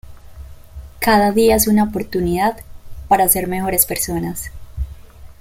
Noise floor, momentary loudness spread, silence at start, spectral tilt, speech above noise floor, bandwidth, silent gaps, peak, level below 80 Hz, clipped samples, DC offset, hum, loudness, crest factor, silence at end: -37 dBFS; 17 LU; 0.05 s; -4 dB/octave; 21 dB; 17 kHz; none; 0 dBFS; -34 dBFS; under 0.1%; under 0.1%; none; -16 LUFS; 18 dB; 0.05 s